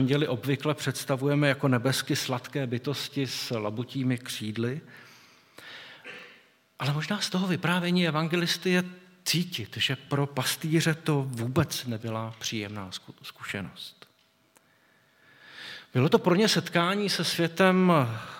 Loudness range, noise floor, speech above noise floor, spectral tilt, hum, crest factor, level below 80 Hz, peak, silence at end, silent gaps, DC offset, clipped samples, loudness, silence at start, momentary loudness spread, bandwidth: 8 LU; -65 dBFS; 38 dB; -5 dB/octave; none; 22 dB; -72 dBFS; -6 dBFS; 0 s; none; under 0.1%; under 0.1%; -27 LUFS; 0 s; 17 LU; 17 kHz